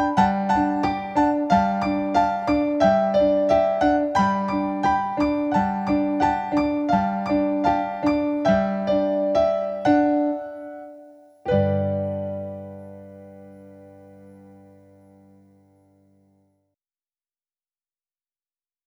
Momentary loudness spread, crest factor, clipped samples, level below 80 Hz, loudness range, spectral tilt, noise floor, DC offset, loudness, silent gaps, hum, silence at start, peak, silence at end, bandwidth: 14 LU; 18 dB; under 0.1%; -48 dBFS; 8 LU; -7.5 dB/octave; under -90 dBFS; under 0.1%; -21 LUFS; none; none; 0 s; -4 dBFS; 4.55 s; 8 kHz